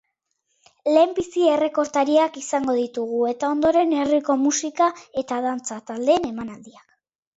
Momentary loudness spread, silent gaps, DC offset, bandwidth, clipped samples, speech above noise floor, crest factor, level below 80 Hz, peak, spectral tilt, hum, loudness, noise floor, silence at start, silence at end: 11 LU; none; under 0.1%; 8 kHz; under 0.1%; 53 dB; 16 dB; -60 dBFS; -4 dBFS; -3.5 dB/octave; none; -21 LUFS; -74 dBFS; 0.85 s; 0.65 s